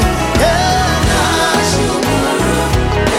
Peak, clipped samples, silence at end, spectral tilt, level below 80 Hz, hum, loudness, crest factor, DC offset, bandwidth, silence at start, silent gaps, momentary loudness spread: -2 dBFS; under 0.1%; 0 s; -4.5 dB/octave; -22 dBFS; none; -13 LUFS; 12 dB; under 0.1%; 16.5 kHz; 0 s; none; 2 LU